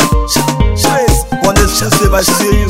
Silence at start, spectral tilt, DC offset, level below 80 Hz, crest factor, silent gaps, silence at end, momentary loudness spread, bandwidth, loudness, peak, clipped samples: 0 s; -4 dB/octave; 2%; -16 dBFS; 10 dB; none; 0 s; 3 LU; 16.5 kHz; -11 LUFS; 0 dBFS; 0.3%